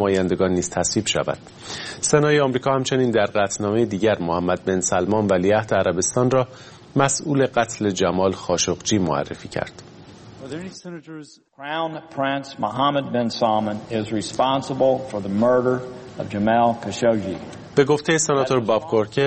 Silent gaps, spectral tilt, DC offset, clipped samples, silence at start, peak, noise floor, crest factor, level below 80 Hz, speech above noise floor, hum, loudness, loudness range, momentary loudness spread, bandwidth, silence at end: none; -4.5 dB/octave; under 0.1%; under 0.1%; 0 s; -2 dBFS; -43 dBFS; 20 dB; -54 dBFS; 22 dB; none; -21 LUFS; 6 LU; 13 LU; 8.8 kHz; 0 s